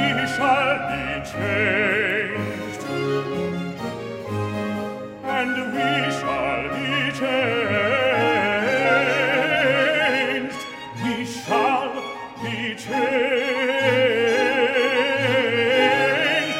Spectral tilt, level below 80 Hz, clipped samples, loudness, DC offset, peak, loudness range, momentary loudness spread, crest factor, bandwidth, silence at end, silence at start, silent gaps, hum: -4.5 dB/octave; -56 dBFS; under 0.1%; -21 LUFS; under 0.1%; -6 dBFS; 6 LU; 10 LU; 16 dB; 16 kHz; 0 s; 0 s; none; none